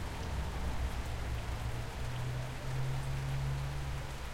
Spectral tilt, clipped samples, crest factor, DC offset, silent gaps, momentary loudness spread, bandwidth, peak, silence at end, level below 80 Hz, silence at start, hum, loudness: -5.5 dB/octave; under 0.1%; 12 dB; under 0.1%; none; 4 LU; 16.5 kHz; -24 dBFS; 0 s; -40 dBFS; 0 s; none; -39 LUFS